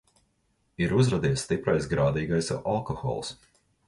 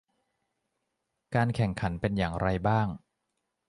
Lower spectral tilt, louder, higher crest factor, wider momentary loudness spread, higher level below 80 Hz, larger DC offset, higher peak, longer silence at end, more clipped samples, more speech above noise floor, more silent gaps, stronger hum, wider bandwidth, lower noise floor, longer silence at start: second, -6 dB/octave vs -7.5 dB/octave; about the same, -27 LUFS vs -29 LUFS; about the same, 16 dB vs 18 dB; first, 8 LU vs 5 LU; about the same, -48 dBFS vs -48 dBFS; neither; about the same, -12 dBFS vs -12 dBFS; second, 0.55 s vs 0.7 s; neither; second, 45 dB vs 54 dB; neither; neither; about the same, 11.5 kHz vs 11 kHz; second, -71 dBFS vs -82 dBFS; second, 0.8 s vs 1.3 s